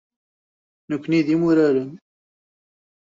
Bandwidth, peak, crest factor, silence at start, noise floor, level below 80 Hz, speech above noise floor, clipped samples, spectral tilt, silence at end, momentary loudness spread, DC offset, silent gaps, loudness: 7.6 kHz; -6 dBFS; 16 dB; 0.9 s; under -90 dBFS; -66 dBFS; over 71 dB; under 0.1%; -8 dB/octave; 1.15 s; 13 LU; under 0.1%; none; -20 LUFS